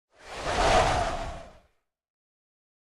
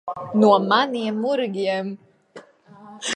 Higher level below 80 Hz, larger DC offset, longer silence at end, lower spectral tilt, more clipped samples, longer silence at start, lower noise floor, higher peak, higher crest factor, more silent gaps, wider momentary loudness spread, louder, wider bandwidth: first, -40 dBFS vs -72 dBFS; neither; first, 1.35 s vs 0 s; about the same, -3.5 dB/octave vs -4.5 dB/octave; neither; first, 0.25 s vs 0.05 s; first, -69 dBFS vs -47 dBFS; second, -10 dBFS vs -4 dBFS; about the same, 20 dB vs 18 dB; neither; first, 19 LU vs 15 LU; second, -26 LUFS vs -20 LUFS; first, 13.5 kHz vs 10.5 kHz